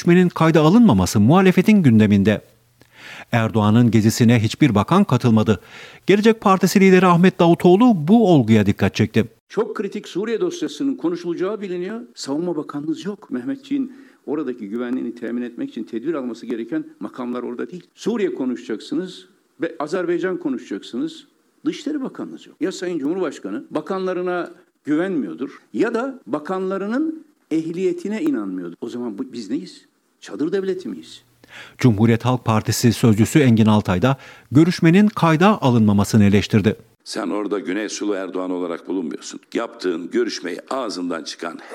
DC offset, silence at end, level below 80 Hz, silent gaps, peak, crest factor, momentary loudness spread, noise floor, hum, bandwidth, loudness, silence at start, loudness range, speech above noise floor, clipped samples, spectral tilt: under 0.1%; 0 s; -60 dBFS; 9.40-9.47 s; -2 dBFS; 16 dB; 15 LU; -52 dBFS; none; 16 kHz; -19 LUFS; 0 s; 11 LU; 34 dB; under 0.1%; -6.5 dB/octave